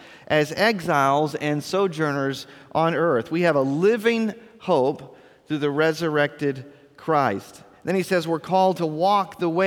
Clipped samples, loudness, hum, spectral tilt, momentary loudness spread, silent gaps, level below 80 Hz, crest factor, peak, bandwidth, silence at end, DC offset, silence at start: under 0.1%; -22 LUFS; none; -6 dB/octave; 9 LU; none; -66 dBFS; 18 dB; -6 dBFS; 18 kHz; 0 s; under 0.1%; 0 s